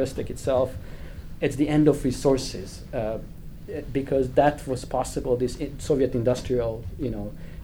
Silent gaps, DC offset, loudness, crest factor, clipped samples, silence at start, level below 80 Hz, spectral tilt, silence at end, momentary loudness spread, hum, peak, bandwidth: none; under 0.1%; -26 LUFS; 18 dB; under 0.1%; 0 s; -40 dBFS; -6.5 dB/octave; 0 s; 16 LU; none; -6 dBFS; over 20 kHz